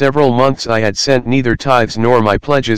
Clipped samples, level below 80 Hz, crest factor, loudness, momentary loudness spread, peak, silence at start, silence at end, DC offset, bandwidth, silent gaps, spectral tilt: 1%; -36 dBFS; 12 dB; -13 LUFS; 3 LU; 0 dBFS; 0 s; 0 s; 5%; 15 kHz; none; -5.5 dB/octave